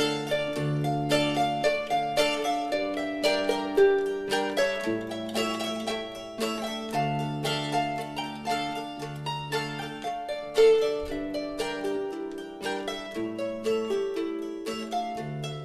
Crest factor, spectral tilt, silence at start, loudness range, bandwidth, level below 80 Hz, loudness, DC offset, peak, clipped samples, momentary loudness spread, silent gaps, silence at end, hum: 18 dB; -4.5 dB/octave; 0 s; 5 LU; 14 kHz; -56 dBFS; -28 LUFS; under 0.1%; -10 dBFS; under 0.1%; 10 LU; none; 0 s; none